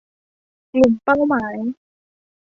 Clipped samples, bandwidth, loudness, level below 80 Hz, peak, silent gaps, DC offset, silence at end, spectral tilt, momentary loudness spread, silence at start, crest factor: under 0.1%; 7.6 kHz; -19 LUFS; -52 dBFS; -2 dBFS; none; under 0.1%; 0.75 s; -7 dB/octave; 12 LU; 0.75 s; 18 dB